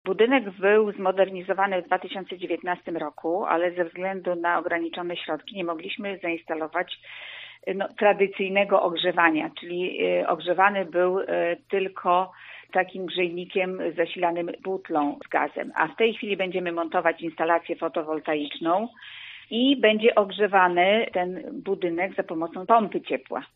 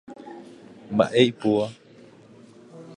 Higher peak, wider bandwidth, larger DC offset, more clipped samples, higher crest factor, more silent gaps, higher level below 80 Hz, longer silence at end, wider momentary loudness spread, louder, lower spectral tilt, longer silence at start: about the same, -4 dBFS vs -4 dBFS; second, 5 kHz vs 10.5 kHz; neither; neither; about the same, 22 dB vs 22 dB; neither; second, -76 dBFS vs -64 dBFS; about the same, 0.1 s vs 0 s; second, 11 LU vs 24 LU; second, -25 LUFS vs -22 LUFS; second, -2.5 dB/octave vs -6 dB/octave; about the same, 0.05 s vs 0.1 s